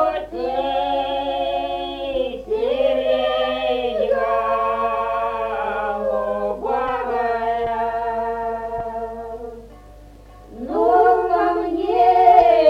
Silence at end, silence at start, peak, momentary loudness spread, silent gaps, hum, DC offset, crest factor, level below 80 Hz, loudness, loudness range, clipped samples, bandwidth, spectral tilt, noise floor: 0 s; 0 s; -2 dBFS; 11 LU; none; 50 Hz at -45 dBFS; under 0.1%; 18 dB; -44 dBFS; -20 LUFS; 5 LU; under 0.1%; 6.4 kHz; -6 dB/octave; -42 dBFS